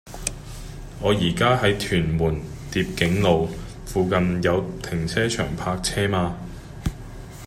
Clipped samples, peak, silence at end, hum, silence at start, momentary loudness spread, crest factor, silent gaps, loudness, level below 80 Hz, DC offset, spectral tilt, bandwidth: under 0.1%; -2 dBFS; 0 s; none; 0.05 s; 16 LU; 22 dB; none; -23 LUFS; -38 dBFS; under 0.1%; -5 dB/octave; 15.5 kHz